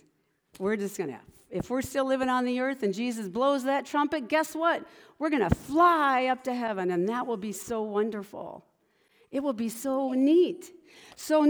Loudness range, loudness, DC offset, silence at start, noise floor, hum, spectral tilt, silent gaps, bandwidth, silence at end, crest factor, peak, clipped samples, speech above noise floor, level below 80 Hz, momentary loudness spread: 6 LU; -28 LUFS; under 0.1%; 0.6 s; -70 dBFS; none; -5.5 dB/octave; none; over 20 kHz; 0 s; 20 dB; -8 dBFS; under 0.1%; 42 dB; -54 dBFS; 14 LU